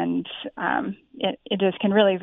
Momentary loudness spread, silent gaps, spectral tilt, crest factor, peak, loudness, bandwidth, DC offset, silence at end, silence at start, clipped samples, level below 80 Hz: 10 LU; none; -9.5 dB/octave; 18 dB; -6 dBFS; -25 LUFS; 3.9 kHz; under 0.1%; 0 s; 0 s; under 0.1%; -64 dBFS